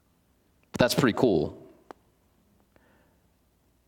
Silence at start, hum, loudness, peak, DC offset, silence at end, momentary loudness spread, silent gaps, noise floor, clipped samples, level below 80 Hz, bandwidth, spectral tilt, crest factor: 0.75 s; none; -25 LUFS; -6 dBFS; under 0.1%; 2.3 s; 18 LU; none; -67 dBFS; under 0.1%; -58 dBFS; 18 kHz; -5.5 dB/octave; 24 dB